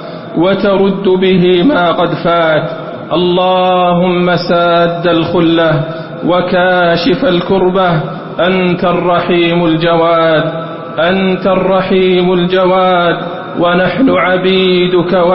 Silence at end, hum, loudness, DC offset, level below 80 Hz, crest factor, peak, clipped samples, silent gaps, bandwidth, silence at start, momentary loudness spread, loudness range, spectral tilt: 0 s; none; -10 LUFS; under 0.1%; -42 dBFS; 10 dB; 0 dBFS; under 0.1%; none; 5.8 kHz; 0 s; 5 LU; 1 LU; -11 dB/octave